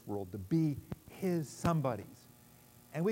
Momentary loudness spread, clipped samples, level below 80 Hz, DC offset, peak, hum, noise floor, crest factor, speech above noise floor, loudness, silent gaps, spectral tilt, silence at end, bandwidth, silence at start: 12 LU; under 0.1%; -62 dBFS; under 0.1%; -20 dBFS; none; -60 dBFS; 18 dB; 25 dB; -36 LUFS; none; -7.5 dB/octave; 0 s; 16 kHz; 0.05 s